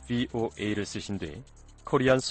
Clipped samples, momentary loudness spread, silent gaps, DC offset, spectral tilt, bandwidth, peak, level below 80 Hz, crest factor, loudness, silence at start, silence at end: under 0.1%; 18 LU; none; under 0.1%; -5 dB/octave; 9.4 kHz; -12 dBFS; -52 dBFS; 18 dB; -29 LUFS; 0 s; 0 s